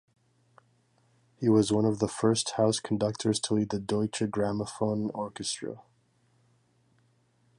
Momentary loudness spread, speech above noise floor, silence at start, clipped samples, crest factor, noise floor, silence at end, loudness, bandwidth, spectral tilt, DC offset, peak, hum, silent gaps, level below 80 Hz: 9 LU; 40 dB; 1.4 s; under 0.1%; 20 dB; -68 dBFS; 1.75 s; -29 LUFS; 11.5 kHz; -5 dB/octave; under 0.1%; -10 dBFS; none; none; -62 dBFS